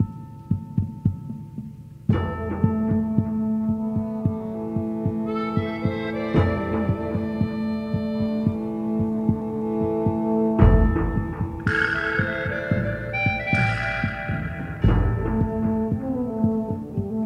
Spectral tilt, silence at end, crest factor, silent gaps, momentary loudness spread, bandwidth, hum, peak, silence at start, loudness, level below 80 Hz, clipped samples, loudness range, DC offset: -9 dB/octave; 0 s; 20 dB; none; 7 LU; 7 kHz; none; -2 dBFS; 0 s; -24 LUFS; -32 dBFS; under 0.1%; 3 LU; under 0.1%